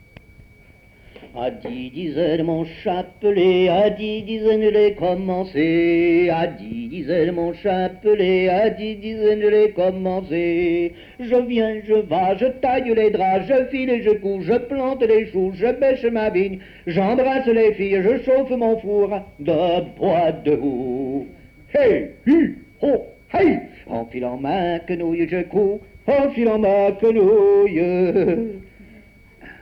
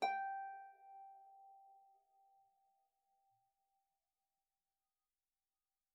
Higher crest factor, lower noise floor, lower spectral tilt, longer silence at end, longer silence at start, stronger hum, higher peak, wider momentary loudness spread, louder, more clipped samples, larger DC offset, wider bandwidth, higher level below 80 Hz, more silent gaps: second, 12 dB vs 26 dB; second, -49 dBFS vs under -90 dBFS; first, -8.5 dB/octave vs 6.5 dB/octave; second, 0.1 s vs 4.1 s; first, 1.2 s vs 0 s; neither; first, -6 dBFS vs -26 dBFS; second, 10 LU vs 23 LU; first, -19 LUFS vs -48 LUFS; neither; neither; first, 5.6 kHz vs 3.9 kHz; first, -48 dBFS vs under -90 dBFS; neither